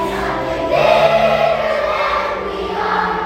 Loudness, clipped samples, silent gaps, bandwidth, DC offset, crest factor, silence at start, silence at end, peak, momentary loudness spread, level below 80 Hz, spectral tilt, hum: -16 LUFS; under 0.1%; none; 15.5 kHz; under 0.1%; 16 dB; 0 s; 0 s; 0 dBFS; 8 LU; -38 dBFS; -5 dB/octave; none